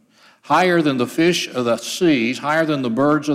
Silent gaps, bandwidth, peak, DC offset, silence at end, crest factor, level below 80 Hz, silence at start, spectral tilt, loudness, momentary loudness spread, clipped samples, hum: none; 15.5 kHz; -4 dBFS; under 0.1%; 0 s; 14 dB; -66 dBFS; 0.45 s; -5 dB/octave; -18 LUFS; 4 LU; under 0.1%; none